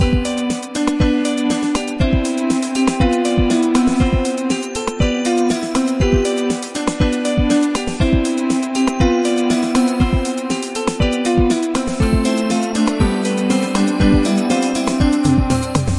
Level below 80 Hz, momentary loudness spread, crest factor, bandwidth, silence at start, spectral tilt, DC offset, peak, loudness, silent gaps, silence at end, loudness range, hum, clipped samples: -26 dBFS; 5 LU; 14 dB; 11.5 kHz; 0 s; -5.5 dB/octave; 0.1%; -2 dBFS; -17 LUFS; none; 0 s; 1 LU; none; under 0.1%